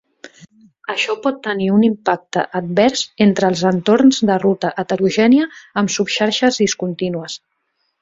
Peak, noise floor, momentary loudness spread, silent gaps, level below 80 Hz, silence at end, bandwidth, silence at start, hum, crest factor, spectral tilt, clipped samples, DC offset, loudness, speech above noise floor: 0 dBFS; -69 dBFS; 10 LU; none; -58 dBFS; 0.65 s; 7.8 kHz; 0.25 s; none; 16 dB; -5 dB/octave; under 0.1%; under 0.1%; -16 LUFS; 53 dB